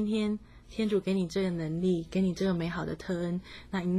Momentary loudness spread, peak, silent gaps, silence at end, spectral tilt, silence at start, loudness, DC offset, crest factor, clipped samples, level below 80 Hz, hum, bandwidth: 8 LU; -18 dBFS; none; 0 s; -7 dB/octave; 0 s; -31 LUFS; under 0.1%; 12 dB; under 0.1%; -54 dBFS; 60 Hz at -55 dBFS; 11 kHz